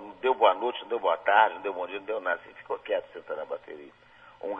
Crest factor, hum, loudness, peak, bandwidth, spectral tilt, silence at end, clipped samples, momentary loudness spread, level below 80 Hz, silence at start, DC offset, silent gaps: 22 dB; none; -28 LUFS; -8 dBFS; 4.9 kHz; -5 dB/octave; 0 s; under 0.1%; 16 LU; -72 dBFS; 0 s; under 0.1%; none